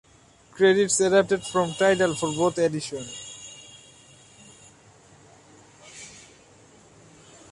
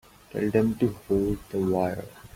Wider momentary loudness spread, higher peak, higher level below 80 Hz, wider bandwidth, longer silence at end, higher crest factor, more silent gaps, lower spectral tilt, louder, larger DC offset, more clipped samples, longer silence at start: first, 23 LU vs 7 LU; about the same, -6 dBFS vs -8 dBFS; second, -64 dBFS vs -48 dBFS; second, 11.5 kHz vs 16.5 kHz; first, 1.35 s vs 0.1 s; about the same, 20 dB vs 18 dB; neither; second, -4 dB/octave vs -8 dB/octave; first, -22 LUFS vs -27 LUFS; neither; neither; first, 0.55 s vs 0.35 s